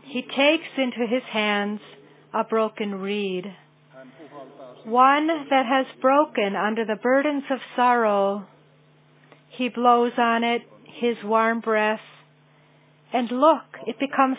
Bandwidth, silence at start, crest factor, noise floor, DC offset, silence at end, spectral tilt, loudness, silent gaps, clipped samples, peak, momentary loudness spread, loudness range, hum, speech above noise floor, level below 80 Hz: 4 kHz; 0.05 s; 20 dB; -56 dBFS; under 0.1%; 0 s; -8.5 dB/octave; -22 LUFS; none; under 0.1%; -4 dBFS; 12 LU; 5 LU; none; 34 dB; -88 dBFS